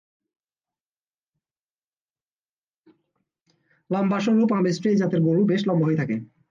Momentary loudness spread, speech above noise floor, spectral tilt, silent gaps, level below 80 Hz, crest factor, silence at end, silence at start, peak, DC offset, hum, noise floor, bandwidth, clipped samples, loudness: 7 LU; over 69 dB; -7.5 dB/octave; none; -68 dBFS; 14 dB; 0.25 s; 3.9 s; -12 dBFS; under 0.1%; none; under -90 dBFS; 7.4 kHz; under 0.1%; -22 LUFS